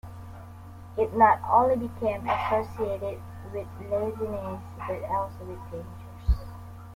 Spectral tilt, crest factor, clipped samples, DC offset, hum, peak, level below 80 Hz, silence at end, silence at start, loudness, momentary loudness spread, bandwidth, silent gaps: -7.5 dB/octave; 22 dB; under 0.1%; under 0.1%; none; -6 dBFS; -40 dBFS; 0 s; 0.05 s; -27 LUFS; 22 LU; 16.5 kHz; none